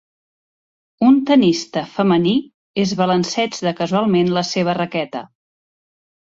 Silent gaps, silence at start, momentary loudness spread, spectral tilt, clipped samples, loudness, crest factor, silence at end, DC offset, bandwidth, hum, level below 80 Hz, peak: 2.54-2.74 s; 1 s; 9 LU; -5.5 dB/octave; under 0.1%; -17 LUFS; 16 dB; 0.95 s; under 0.1%; 7.8 kHz; none; -60 dBFS; -2 dBFS